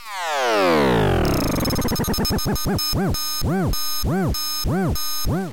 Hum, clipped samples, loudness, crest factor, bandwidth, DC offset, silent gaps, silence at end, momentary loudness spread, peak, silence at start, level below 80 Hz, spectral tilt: none; under 0.1%; -21 LUFS; 10 dB; 17 kHz; under 0.1%; none; 0 s; 5 LU; -12 dBFS; 0 s; -30 dBFS; -4.5 dB/octave